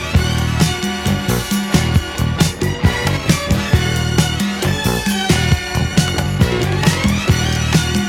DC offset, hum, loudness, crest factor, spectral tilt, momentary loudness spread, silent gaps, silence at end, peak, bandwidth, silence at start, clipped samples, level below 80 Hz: under 0.1%; none; -16 LUFS; 16 dB; -4.5 dB/octave; 3 LU; none; 0 s; 0 dBFS; 17 kHz; 0 s; under 0.1%; -26 dBFS